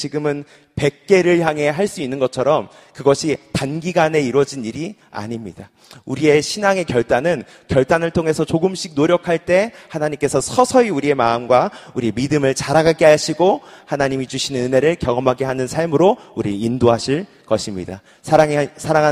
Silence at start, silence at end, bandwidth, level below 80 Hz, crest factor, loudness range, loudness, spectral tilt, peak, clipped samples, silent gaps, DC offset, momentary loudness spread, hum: 0 s; 0 s; 15 kHz; -48 dBFS; 18 dB; 3 LU; -17 LUFS; -5.5 dB/octave; 0 dBFS; under 0.1%; none; under 0.1%; 11 LU; none